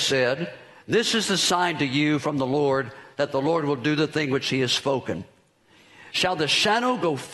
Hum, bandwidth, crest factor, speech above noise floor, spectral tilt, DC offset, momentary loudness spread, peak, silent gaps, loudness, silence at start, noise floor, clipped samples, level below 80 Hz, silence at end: none; 12 kHz; 16 dB; 34 dB; -4 dB/octave; under 0.1%; 9 LU; -8 dBFS; none; -23 LUFS; 0 s; -58 dBFS; under 0.1%; -64 dBFS; 0 s